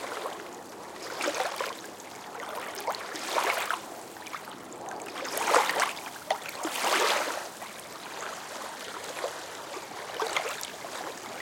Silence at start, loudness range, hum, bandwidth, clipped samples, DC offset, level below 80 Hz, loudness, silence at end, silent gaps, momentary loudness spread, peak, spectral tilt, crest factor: 0 s; 7 LU; none; 17 kHz; under 0.1%; under 0.1%; -76 dBFS; -32 LUFS; 0 s; none; 15 LU; -6 dBFS; -1 dB/octave; 28 dB